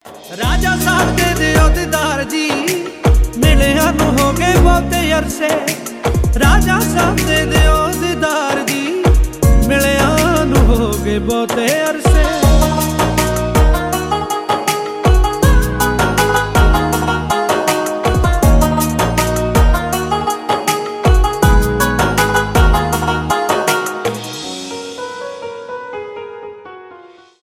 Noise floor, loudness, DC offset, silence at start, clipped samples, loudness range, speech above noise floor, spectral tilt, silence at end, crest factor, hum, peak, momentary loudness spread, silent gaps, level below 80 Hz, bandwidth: -40 dBFS; -14 LUFS; under 0.1%; 0.05 s; under 0.1%; 2 LU; 27 dB; -5 dB/octave; 0.35 s; 14 dB; none; 0 dBFS; 9 LU; none; -18 dBFS; 16.5 kHz